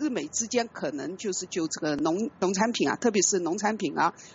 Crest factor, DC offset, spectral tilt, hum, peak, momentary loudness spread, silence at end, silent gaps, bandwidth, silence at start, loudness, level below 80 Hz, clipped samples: 18 dB; under 0.1%; -3 dB/octave; none; -10 dBFS; 8 LU; 0 s; none; 8.2 kHz; 0 s; -27 LUFS; -68 dBFS; under 0.1%